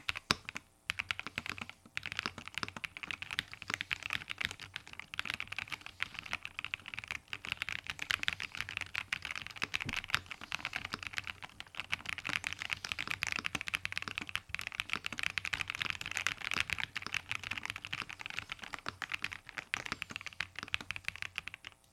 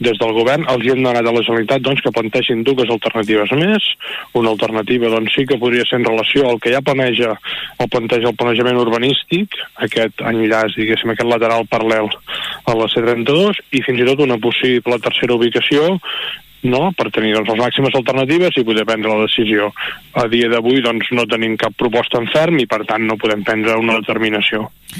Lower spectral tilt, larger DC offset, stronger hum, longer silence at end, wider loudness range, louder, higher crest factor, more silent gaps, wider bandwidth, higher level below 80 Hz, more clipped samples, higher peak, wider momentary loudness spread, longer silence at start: second, -1.5 dB/octave vs -5.5 dB/octave; neither; neither; first, 0.25 s vs 0 s; first, 4 LU vs 1 LU; second, -39 LUFS vs -15 LUFS; first, 36 dB vs 12 dB; neither; first, 19 kHz vs 15.5 kHz; second, -64 dBFS vs -52 dBFS; neither; about the same, -4 dBFS vs -2 dBFS; about the same, 7 LU vs 5 LU; about the same, 0 s vs 0 s